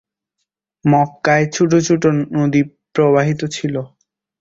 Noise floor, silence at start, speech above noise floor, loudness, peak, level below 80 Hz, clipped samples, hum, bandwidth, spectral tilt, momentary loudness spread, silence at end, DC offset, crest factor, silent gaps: -76 dBFS; 0.85 s; 61 dB; -16 LUFS; -2 dBFS; -54 dBFS; under 0.1%; none; 7.8 kHz; -6 dB/octave; 8 LU; 0.55 s; under 0.1%; 16 dB; none